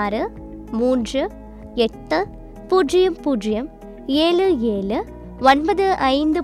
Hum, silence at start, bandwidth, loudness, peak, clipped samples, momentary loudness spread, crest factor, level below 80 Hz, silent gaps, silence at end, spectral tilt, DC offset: none; 0 s; 13 kHz; -20 LUFS; -2 dBFS; under 0.1%; 14 LU; 16 dB; -40 dBFS; none; 0 s; -5 dB/octave; under 0.1%